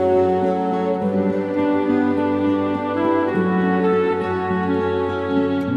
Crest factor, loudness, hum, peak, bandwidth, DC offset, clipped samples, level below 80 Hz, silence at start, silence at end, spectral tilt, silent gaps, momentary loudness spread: 12 dB; -20 LUFS; none; -6 dBFS; 7 kHz; under 0.1%; under 0.1%; -58 dBFS; 0 s; 0 s; -8.5 dB/octave; none; 3 LU